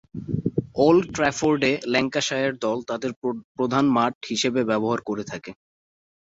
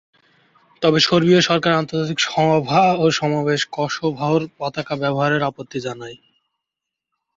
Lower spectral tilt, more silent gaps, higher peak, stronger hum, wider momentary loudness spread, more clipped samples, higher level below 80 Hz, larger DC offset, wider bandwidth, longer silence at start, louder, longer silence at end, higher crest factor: about the same, -5 dB/octave vs -5 dB/octave; first, 3.16-3.22 s, 3.44-3.55 s, 4.15-4.21 s vs none; second, -6 dBFS vs -2 dBFS; neither; about the same, 11 LU vs 13 LU; neither; about the same, -56 dBFS vs -58 dBFS; neither; about the same, 8 kHz vs 7.8 kHz; second, 0.15 s vs 0.8 s; second, -23 LUFS vs -18 LUFS; second, 0.75 s vs 1.2 s; about the same, 18 dB vs 18 dB